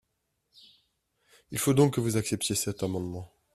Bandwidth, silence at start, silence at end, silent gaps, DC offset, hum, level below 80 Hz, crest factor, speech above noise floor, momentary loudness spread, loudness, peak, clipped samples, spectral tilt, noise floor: 15.5 kHz; 1.5 s; 0.3 s; none; under 0.1%; none; -60 dBFS; 20 dB; 51 dB; 14 LU; -28 LUFS; -10 dBFS; under 0.1%; -5 dB/octave; -79 dBFS